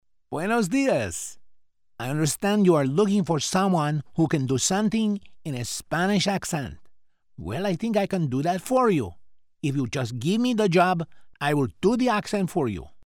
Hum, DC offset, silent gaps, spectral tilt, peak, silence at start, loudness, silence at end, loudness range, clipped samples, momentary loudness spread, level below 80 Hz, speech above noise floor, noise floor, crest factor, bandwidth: none; under 0.1%; none; -5 dB/octave; -8 dBFS; 0.3 s; -24 LUFS; 0 s; 4 LU; under 0.1%; 11 LU; -54 dBFS; 30 dB; -54 dBFS; 18 dB; 18 kHz